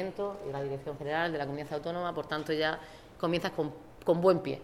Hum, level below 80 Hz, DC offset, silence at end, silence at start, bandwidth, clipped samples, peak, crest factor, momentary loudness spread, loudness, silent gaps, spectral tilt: none; -60 dBFS; under 0.1%; 0 s; 0 s; 16 kHz; under 0.1%; -12 dBFS; 20 dB; 10 LU; -33 LUFS; none; -6.5 dB/octave